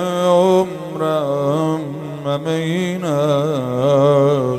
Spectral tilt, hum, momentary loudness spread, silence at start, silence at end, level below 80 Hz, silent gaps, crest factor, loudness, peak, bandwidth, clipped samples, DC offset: -7 dB/octave; none; 10 LU; 0 s; 0 s; -58 dBFS; none; 14 dB; -17 LUFS; -2 dBFS; 15.5 kHz; under 0.1%; under 0.1%